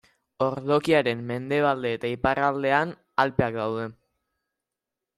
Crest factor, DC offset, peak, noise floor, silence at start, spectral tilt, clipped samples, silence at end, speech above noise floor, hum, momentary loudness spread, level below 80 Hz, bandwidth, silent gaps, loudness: 20 dB; under 0.1%; -6 dBFS; -87 dBFS; 0.4 s; -6.5 dB/octave; under 0.1%; 1.25 s; 62 dB; none; 7 LU; -56 dBFS; 13 kHz; none; -25 LUFS